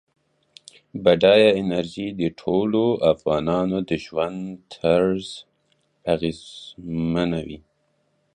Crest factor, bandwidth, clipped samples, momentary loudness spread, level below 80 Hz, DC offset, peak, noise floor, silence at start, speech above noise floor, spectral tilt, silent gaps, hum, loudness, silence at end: 20 dB; 10 kHz; under 0.1%; 20 LU; -52 dBFS; under 0.1%; -2 dBFS; -68 dBFS; 0.95 s; 47 dB; -6.5 dB/octave; none; none; -21 LUFS; 0.75 s